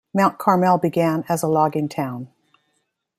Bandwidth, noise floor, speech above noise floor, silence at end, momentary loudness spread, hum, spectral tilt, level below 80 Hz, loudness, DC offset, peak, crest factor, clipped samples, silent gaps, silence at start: 16 kHz; -72 dBFS; 52 dB; 0.9 s; 11 LU; none; -6.5 dB/octave; -64 dBFS; -20 LUFS; under 0.1%; -4 dBFS; 18 dB; under 0.1%; none; 0.15 s